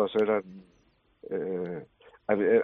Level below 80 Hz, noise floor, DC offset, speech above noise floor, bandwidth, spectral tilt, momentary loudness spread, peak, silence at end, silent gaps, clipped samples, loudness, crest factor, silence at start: -70 dBFS; -60 dBFS; under 0.1%; 32 dB; 4.1 kHz; -5 dB/octave; 24 LU; -10 dBFS; 0 s; none; under 0.1%; -30 LUFS; 18 dB; 0 s